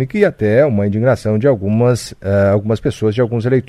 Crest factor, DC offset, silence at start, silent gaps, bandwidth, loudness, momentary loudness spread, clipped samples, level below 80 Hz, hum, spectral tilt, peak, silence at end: 14 dB; under 0.1%; 0 s; none; 12.5 kHz; -15 LUFS; 4 LU; under 0.1%; -44 dBFS; none; -7.5 dB/octave; 0 dBFS; 0.05 s